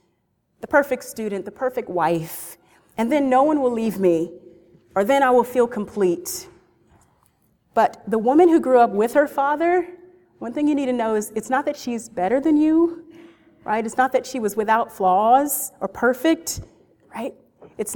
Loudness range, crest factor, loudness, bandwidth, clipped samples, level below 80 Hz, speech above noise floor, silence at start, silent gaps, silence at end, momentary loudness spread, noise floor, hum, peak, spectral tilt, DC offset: 3 LU; 18 dB; -20 LUFS; 19 kHz; under 0.1%; -58 dBFS; 49 dB; 0.65 s; none; 0 s; 16 LU; -69 dBFS; none; -2 dBFS; -5 dB/octave; under 0.1%